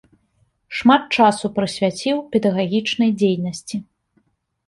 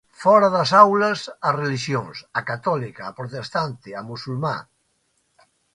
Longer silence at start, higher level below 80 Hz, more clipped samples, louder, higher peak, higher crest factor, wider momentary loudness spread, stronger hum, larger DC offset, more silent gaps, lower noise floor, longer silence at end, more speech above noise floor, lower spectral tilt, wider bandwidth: first, 0.7 s vs 0.2 s; about the same, -60 dBFS vs -62 dBFS; neither; about the same, -19 LUFS vs -20 LUFS; about the same, -2 dBFS vs 0 dBFS; about the same, 18 dB vs 22 dB; second, 13 LU vs 18 LU; neither; neither; neither; second, -64 dBFS vs -68 dBFS; second, 0.85 s vs 1.15 s; about the same, 46 dB vs 48 dB; about the same, -5.5 dB/octave vs -5.5 dB/octave; about the same, 11.5 kHz vs 11 kHz